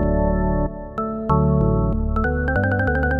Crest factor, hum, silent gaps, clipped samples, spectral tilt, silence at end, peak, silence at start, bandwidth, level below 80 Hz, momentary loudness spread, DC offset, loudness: 14 dB; none; none; under 0.1%; -11 dB/octave; 0 s; -6 dBFS; 0 s; 4.8 kHz; -24 dBFS; 8 LU; under 0.1%; -21 LUFS